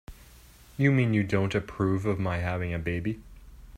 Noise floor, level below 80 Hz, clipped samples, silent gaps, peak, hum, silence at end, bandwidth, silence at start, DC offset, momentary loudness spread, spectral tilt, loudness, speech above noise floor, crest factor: -52 dBFS; -50 dBFS; under 0.1%; none; -10 dBFS; none; 0 s; 15 kHz; 0.1 s; under 0.1%; 9 LU; -8 dB/octave; -28 LUFS; 26 dB; 20 dB